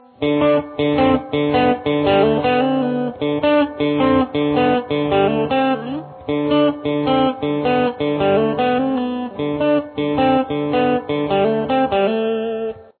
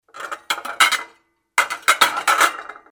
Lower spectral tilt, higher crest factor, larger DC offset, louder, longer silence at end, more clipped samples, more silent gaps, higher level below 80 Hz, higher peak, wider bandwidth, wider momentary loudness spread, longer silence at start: first, -10 dB/octave vs 1.5 dB/octave; second, 14 dB vs 20 dB; neither; about the same, -18 LUFS vs -18 LUFS; about the same, 0.15 s vs 0.2 s; neither; neither; first, -48 dBFS vs -68 dBFS; second, -4 dBFS vs 0 dBFS; second, 4.5 kHz vs over 20 kHz; second, 6 LU vs 15 LU; about the same, 0.2 s vs 0.15 s